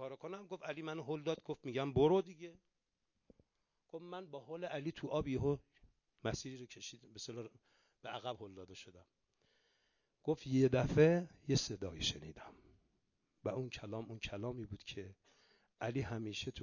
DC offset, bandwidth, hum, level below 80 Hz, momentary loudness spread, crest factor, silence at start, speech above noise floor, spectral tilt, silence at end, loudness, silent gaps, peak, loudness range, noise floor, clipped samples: under 0.1%; 7.4 kHz; none; -62 dBFS; 21 LU; 24 dB; 0 s; 48 dB; -5.5 dB/octave; 0 s; -39 LUFS; none; -18 dBFS; 12 LU; -87 dBFS; under 0.1%